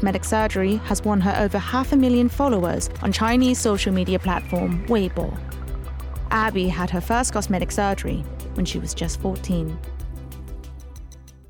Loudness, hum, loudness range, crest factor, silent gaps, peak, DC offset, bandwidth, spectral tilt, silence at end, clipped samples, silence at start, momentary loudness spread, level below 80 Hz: -22 LUFS; none; 6 LU; 14 dB; none; -8 dBFS; under 0.1%; 19 kHz; -5.5 dB/octave; 0.05 s; under 0.1%; 0 s; 15 LU; -32 dBFS